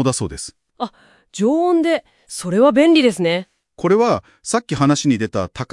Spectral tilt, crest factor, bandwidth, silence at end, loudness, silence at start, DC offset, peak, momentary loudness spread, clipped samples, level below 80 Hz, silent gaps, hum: -5 dB/octave; 16 dB; 12 kHz; 0.1 s; -17 LUFS; 0 s; under 0.1%; -2 dBFS; 16 LU; under 0.1%; -50 dBFS; none; none